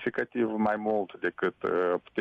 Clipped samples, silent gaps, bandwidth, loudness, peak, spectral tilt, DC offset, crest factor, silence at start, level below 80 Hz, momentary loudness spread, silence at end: under 0.1%; none; 6.2 kHz; -29 LUFS; -16 dBFS; -8 dB/octave; under 0.1%; 14 dB; 0 s; -68 dBFS; 4 LU; 0 s